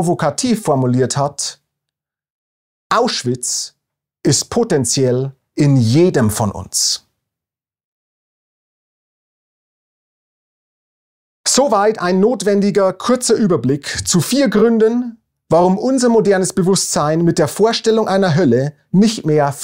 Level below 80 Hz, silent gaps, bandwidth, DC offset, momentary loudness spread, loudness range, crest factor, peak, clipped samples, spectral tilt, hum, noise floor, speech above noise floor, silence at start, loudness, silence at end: -50 dBFS; 2.30-2.90 s, 7.84-11.44 s; 16 kHz; under 0.1%; 6 LU; 7 LU; 16 dB; -2 dBFS; under 0.1%; -5 dB/octave; none; -88 dBFS; 74 dB; 0 s; -15 LUFS; 0 s